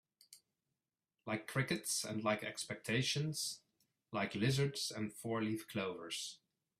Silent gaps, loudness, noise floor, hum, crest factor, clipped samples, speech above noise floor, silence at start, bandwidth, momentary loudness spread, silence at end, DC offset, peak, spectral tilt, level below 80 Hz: none; -39 LUFS; under -90 dBFS; none; 20 dB; under 0.1%; over 51 dB; 0.3 s; 15.5 kHz; 8 LU; 0.45 s; under 0.1%; -20 dBFS; -4 dB/octave; -74 dBFS